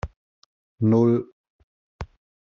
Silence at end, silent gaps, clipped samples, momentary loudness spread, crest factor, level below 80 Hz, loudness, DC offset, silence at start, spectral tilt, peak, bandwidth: 0.45 s; 0.16-0.78 s, 1.32-1.44 s, 1.50-1.99 s; under 0.1%; 22 LU; 18 dB; -48 dBFS; -21 LUFS; under 0.1%; 0.05 s; -10 dB/octave; -8 dBFS; 6.8 kHz